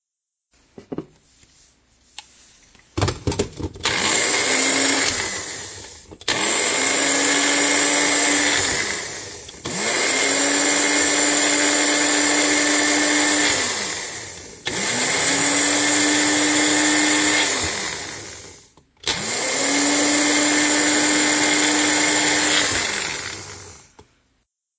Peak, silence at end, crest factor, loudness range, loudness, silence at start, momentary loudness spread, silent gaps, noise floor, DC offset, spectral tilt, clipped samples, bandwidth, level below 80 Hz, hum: -6 dBFS; 1 s; 16 dB; 4 LU; -17 LUFS; 0.8 s; 14 LU; none; -83 dBFS; under 0.1%; -1 dB/octave; under 0.1%; 8 kHz; -48 dBFS; none